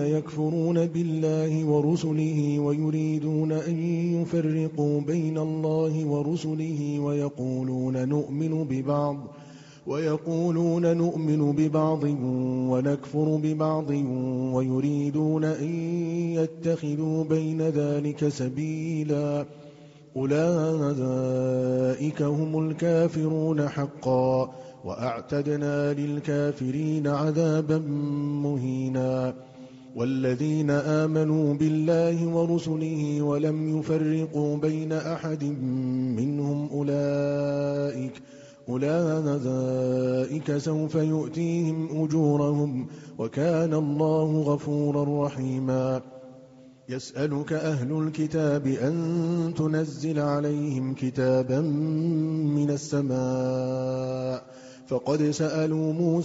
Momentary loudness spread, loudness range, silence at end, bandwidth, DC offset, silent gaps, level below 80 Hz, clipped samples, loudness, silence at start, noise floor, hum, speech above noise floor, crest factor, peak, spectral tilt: 6 LU; 3 LU; 0 s; 8 kHz; under 0.1%; none; -64 dBFS; under 0.1%; -26 LUFS; 0 s; -51 dBFS; none; 25 dB; 14 dB; -12 dBFS; -8.5 dB/octave